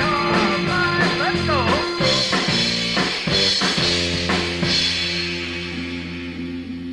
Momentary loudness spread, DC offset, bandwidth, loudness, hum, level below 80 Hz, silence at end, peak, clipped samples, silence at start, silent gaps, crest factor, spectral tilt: 11 LU; under 0.1%; 11.5 kHz; -19 LUFS; none; -42 dBFS; 0 s; -6 dBFS; under 0.1%; 0 s; none; 14 dB; -3.5 dB/octave